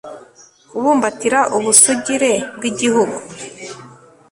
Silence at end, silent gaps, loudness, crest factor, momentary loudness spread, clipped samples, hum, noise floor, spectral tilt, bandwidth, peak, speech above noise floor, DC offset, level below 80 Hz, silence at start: 0.4 s; none; -14 LUFS; 18 dB; 23 LU; under 0.1%; none; -46 dBFS; -2 dB/octave; 16 kHz; 0 dBFS; 31 dB; under 0.1%; -60 dBFS; 0.05 s